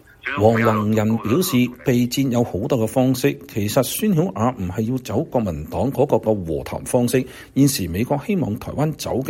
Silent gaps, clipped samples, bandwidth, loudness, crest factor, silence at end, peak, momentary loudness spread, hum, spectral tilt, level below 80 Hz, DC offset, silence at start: none; under 0.1%; 16.5 kHz; -20 LUFS; 18 dB; 0 s; -2 dBFS; 6 LU; none; -6 dB/octave; -46 dBFS; under 0.1%; 0.25 s